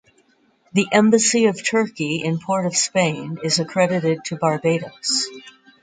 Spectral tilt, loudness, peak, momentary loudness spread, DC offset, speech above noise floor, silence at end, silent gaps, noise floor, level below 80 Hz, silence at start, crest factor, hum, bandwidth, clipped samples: -4 dB/octave; -19 LUFS; -2 dBFS; 8 LU; under 0.1%; 40 dB; 0.3 s; none; -60 dBFS; -64 dBFS; 0.75 s; 18 dB; none; 9.6 kHz; under 0.1%